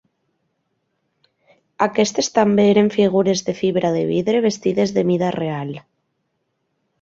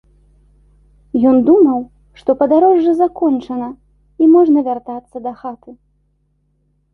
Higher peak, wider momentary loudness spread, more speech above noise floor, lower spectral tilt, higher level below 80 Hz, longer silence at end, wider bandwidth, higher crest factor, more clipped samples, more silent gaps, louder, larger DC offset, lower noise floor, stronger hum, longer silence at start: about the same, -2 dBFS vs 0 dBFS; second, 9 LU vs 18 LU; first, 54 dB vs 49 dB; second, -5.5 dB/octave vs -9 dB/octave; second, -60 dBFS vs -52 dBFS; about the same, 1.25 s vs 1.2 s; first, 7.8 kHz vs 4.4 kHz; about the same, 18 dB vs 14 dB; neither; neither; second, -18 LUFS vs -13 LUFS; neither; first, -72 dBFS vs -62 dBFS; second, none vs 50 Hz at -50 dBFS; first, 1.8 s vs 1.15 s